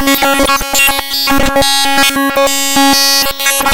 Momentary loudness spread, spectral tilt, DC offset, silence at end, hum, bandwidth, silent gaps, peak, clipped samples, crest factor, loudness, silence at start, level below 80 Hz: 3 LU; -1.5 dB/octave; under 0.1%; 0 s; none; 17.5 kHz; none; -2 dBFS; under 0.1%; 8 dB; -9 LUFS; 0 s; -28 dBFS